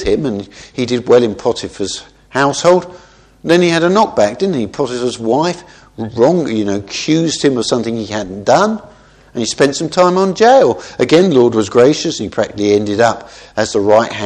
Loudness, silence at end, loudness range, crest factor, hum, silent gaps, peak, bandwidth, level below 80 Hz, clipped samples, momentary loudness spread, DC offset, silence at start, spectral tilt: -13 LUFS; 0 s; 4 LU; 14 dB; none; none; 0 dBFS; 10.5 kHz; -46 dBFS; 0.1%; 11 LU; under 0.1%; 0 s; -5 dB/octave